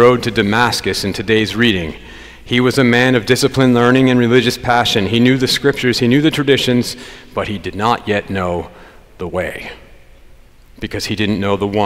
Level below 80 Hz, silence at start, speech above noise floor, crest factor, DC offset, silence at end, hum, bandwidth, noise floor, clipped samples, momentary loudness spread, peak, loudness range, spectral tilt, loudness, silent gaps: -40 dBFS; 0 s; 28 dB; 14 dB; under 0.1%; 0 s; none; 16 kHz; -42 dBFS; under 0.1%; 14 LU; 0 dBFS; 9 LU; -5 dB/octave; -14 LUFS; none